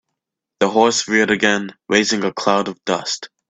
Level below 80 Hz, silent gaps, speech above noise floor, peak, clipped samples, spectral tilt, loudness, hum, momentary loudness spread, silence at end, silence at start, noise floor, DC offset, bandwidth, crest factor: -58 dBFS; none; 62 dB; 0 dBFS; under 0.1%; -3 dB/octave; -17 LUFS; none; 7 LU; 0.25 s; 0.6 s; -80 dBFS; under 0.1%; 9.2 kHz; 18 dB